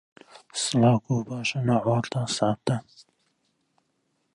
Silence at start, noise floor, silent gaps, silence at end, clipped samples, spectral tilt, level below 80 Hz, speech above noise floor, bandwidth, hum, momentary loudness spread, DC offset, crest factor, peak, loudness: 0.55 s; -73 dBFS; none; 1.55 s; under 0.1%; -5.5 dB/octave; -62 dBFS; 49 dB; 11.5 kHz; none; 8 LU; under 0.1%; 18 dB; -8 dBFS; -25 LUFS